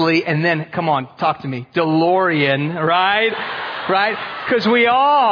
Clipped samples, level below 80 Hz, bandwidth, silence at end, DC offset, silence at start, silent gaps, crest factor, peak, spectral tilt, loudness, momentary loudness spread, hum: under 0.1%; -62 dBFS; 5.4 kHz; 0 s; under 0.1%; 0 s; none; 14 dB; -2 dBFS; -7 dB/octave; -17 LUFS; 10 LU; none